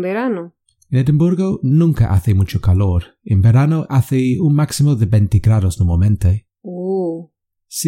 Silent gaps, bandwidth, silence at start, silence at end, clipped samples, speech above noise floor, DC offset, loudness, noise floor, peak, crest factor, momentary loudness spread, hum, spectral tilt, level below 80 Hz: none; 16 kHz; 0 s; 0 s; under 0.1%; 35 dB; under 0.1%; -16 LUFS; -49 dBFS; -2 dBFS; 12 dB; 9 LU; none; -7.5 dB/octave; -32 dBFS